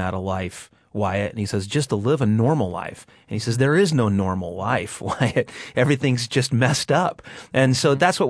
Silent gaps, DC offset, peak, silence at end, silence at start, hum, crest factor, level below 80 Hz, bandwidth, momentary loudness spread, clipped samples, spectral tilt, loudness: none; under 0.1%; -4 dBFS; 0 s; 0 s; none; 18 dB; -54 dBFS; 11 kHz; 10 LU; under 0.1%; -5.5 dB/octave; -21 LUFS